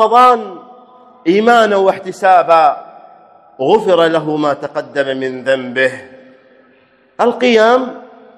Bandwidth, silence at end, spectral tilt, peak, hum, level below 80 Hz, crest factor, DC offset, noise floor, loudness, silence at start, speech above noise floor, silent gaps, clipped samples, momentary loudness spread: 12.5 kHz; 0.35 s; -5 dB/octave; 0 dBFS; none; -62 dBFS; 14 dB; under 0.1%; -51 dBFS; -12 LUFS; 0 s; 39 dB; none; 0.4%; 11 LU